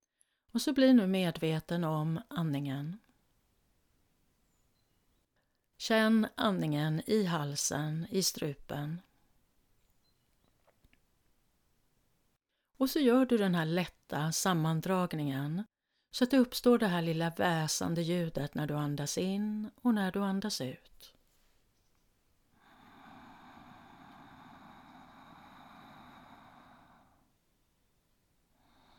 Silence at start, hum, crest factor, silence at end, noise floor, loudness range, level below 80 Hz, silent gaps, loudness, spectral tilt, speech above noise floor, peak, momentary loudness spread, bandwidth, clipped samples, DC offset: 0.55 s; none; 20 dB; 2.65 s; -79 dBFS; 11 LU; -66 dBFS; none; -32 LUFS; -5 dB/octave; 48 dB; -14 dBFS; 12 LU; 19 kHz; under 0.1%; under 0.1%